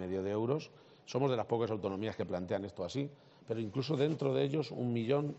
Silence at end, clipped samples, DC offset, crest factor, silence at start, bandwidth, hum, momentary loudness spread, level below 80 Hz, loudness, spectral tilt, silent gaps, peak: 0 s; under 0.1%; under 0.1%; 18 dB; 0 s; 8 kHz; none; 8 LU; -76 dBFS; -36 LUFS; -6.5 dB/octave; none; -18 dBFS